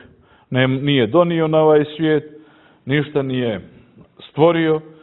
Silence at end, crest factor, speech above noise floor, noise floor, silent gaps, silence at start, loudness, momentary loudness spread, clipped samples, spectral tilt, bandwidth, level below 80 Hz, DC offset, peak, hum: 0.2 s; 18 dB; 33 dB; -49 dBFS; none; 0.5 s; -17 LUFS; 10 LU; under 0.1%; -11.5 dB/octave; 4.1 kHz; -56 dBFS; under 0.1%; 0 dBFS; none